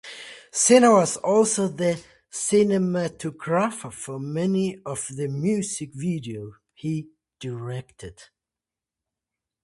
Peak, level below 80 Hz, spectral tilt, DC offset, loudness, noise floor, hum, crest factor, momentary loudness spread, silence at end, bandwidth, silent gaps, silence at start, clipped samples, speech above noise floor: -4 dBFS; -62 dBFS; -5 dB/octave; under 0.1%; -23 LUFS; -89 dBFS; none; 20 dB; 19 LU; 1.4 s; 11.5 kHz; none; 0.05 s; under 0.1%; 66 dB